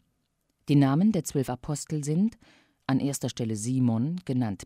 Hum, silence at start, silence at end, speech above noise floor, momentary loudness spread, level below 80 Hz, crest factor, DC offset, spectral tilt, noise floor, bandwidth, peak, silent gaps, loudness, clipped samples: none; 0.65 s; 0 s; 49 dB; 9 LU; -60 dBFS; 16 dB; under 0.1%; -6.5 dB/octave; -75 dBFS; 16 kHz; -12 dBFS; none; -27 LUFS; under 0.1%